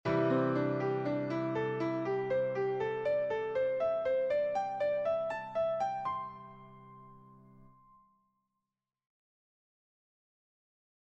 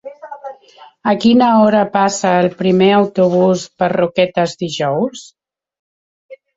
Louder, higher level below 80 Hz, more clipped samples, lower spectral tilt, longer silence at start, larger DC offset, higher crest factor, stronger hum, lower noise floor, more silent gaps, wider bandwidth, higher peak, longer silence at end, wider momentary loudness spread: second, -33 LUFS vs -14 LUFS; second, -70 dBFS vs -56 dBFS; neither; first, -8 dB/octave vs -5.5 dB/octave; about the same, 0.05 s vs 0.05 s; neither; about the same, 16 dB vs 14 dB; neither; first, under -90 dBFS vs -44 dBFS; second, none vs 5.79-6.29 s; about the same, 8 kHz vs 8 kHz; second, -20 dBFS vs -2 dBFS; first, 3.4 s vs 0.2 s; second, 8 LU vs 20 LU